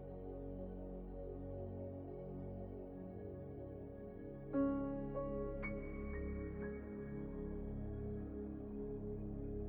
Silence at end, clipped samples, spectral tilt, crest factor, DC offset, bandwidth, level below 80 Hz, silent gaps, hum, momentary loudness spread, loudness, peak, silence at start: 0 s; under 0.1%; -11.5 dB/octave; 18 dB; under 0.1%; 3.5 kHz; -52 dBFS; none; none; 8 LU; -46 LUFS; -26 dBFS; 0 s